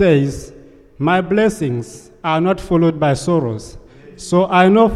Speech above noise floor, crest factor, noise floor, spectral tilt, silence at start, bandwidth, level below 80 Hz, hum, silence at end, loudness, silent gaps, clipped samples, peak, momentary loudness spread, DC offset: 27 dB; 14 dB; -42 dBFS; -6.5 dB/octave; 0 s; 12.5 kHz; -42 dBFS; none; 0 s; -16 LUFS; none; under 0.1%; -2 dBFS; 14 LU; under 0.1%